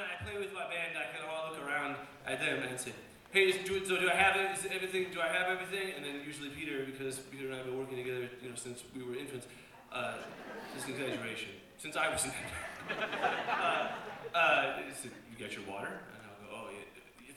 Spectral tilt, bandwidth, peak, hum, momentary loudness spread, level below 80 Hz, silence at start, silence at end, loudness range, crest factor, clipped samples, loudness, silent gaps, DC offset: -3 dB/octave; 18 kHz; -14 dBFS; none; 17 LU; -68 dBFS; 0 s; 0 s; 10 LU; 24 dB; under 0.1%; -35 LUFS; none; under 0.1%